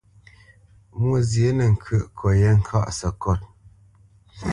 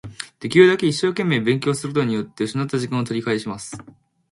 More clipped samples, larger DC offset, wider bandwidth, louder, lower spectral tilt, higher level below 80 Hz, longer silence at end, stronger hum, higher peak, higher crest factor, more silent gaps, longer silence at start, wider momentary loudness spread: neither; neither; about the same, 11 kHz vs 11.5 kHz; about the same, -22 LUFS vs -20 LUFS; first, -7 dB/octave vs -5.5 dB/octave; first, -36 dBFS vs -58 dBFS; second, 0 s vs 0.5 s; neither; second, -6 dBFS vs 0 dBFS; about the same, 16 dB vs 20 dB; neither; first, 0.95 s vs 0.05 s; second, 9 LU vs 17 LU